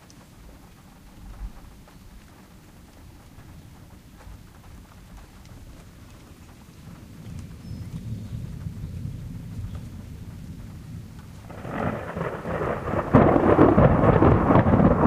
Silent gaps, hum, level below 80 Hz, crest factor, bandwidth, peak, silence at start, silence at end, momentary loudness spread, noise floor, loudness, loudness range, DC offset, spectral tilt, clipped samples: none; none; -38 dBFS; 24 dB; 15.5 kHz; -2 dBFS; 0.45 s; 0 s; 27 LU; -48 dBFS; -22 LUFS; 27 LU; under 0.1%; -9 dB/octave; under 0.1%